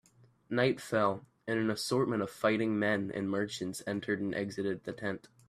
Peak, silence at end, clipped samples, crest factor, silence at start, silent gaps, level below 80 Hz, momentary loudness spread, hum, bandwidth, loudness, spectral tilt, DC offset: -14 dBFS; 0.3 s; under 0.1%; 20 dB; 0.5 s; none; -72 dBFS; 7 LU; none; 14.5 kHz; -33 LUFS; -5.5 dB/octave; under 0.1%